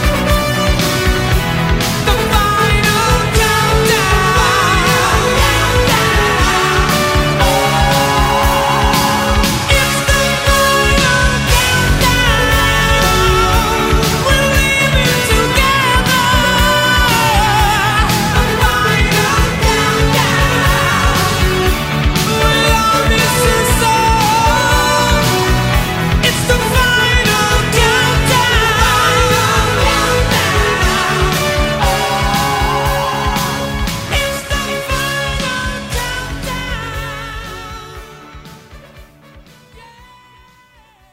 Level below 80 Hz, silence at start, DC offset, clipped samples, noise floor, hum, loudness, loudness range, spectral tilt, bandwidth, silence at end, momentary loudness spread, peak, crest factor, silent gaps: -20 dBFS; 0 s; under 0.1%; under 0.1%; -48 dBFS; none; -12 LUFS; 7 LU; -3.5 dB/octave; 16.5 kHz; 1.7 s; 6 LU; 0 dBFS; 12 dB; none